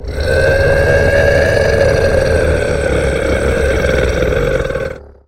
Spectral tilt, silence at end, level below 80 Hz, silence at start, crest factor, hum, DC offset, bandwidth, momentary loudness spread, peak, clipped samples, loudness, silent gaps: -6 dB/octave; 0.2 s; -20 dBFS; 0 s; 12 dB; none; under 0.1%; 15.5 kHz; 5 LU; 0 dBFS; under 0.1%; -13 LUFS; none